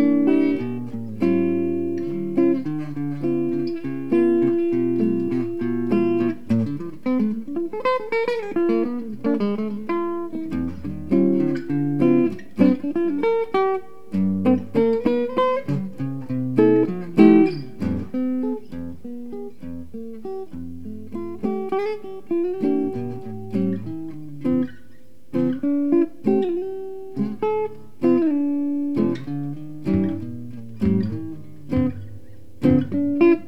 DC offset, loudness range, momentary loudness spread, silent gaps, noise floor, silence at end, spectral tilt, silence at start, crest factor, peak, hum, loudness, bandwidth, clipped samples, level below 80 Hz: 2%; 7 LU; 14 LU; none; -52 dBFS; 0 s; -9.5 dB/octave; 0 s; 20 dB; -2 dBFS; none; -22 LUFS; 6 kHz; under 0.1%; -52 dBFS